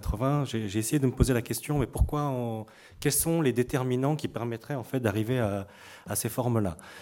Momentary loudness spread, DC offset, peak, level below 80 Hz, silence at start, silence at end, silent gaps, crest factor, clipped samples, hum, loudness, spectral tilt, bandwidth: 9 LU; under 0.1%; -8 dBFS; -40 dBFS; 0 s; 0 s; none; 20 dB; under 0.1%; none; -29 LUFS; -5.5 dB/octave; 17 kHz